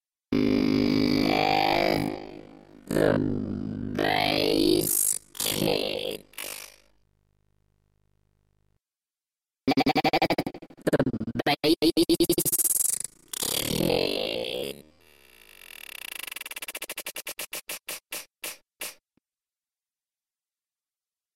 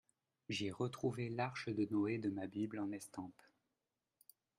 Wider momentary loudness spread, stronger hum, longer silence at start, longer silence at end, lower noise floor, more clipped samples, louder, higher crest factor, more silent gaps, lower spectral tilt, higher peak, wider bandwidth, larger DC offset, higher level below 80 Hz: first, 15 LU vs 12 LU; neither; second, 0.3 s vs 0.5 s; first, 2.45 s vs 1.25 s; about the same, under -90 dBFS vs under -90 dBFS; neither; first, -26 LUFS vs -42 LUFS; about the same, 18 dB vs 16 dB; neither; second, -3.5 dB/octave vs -6 dB/octave; first, -10 dBFS vs -26 dBFS; about the same, 16.5 kHz vs 15 kHz; neither; first, -54 dBFS vs -80 dBFS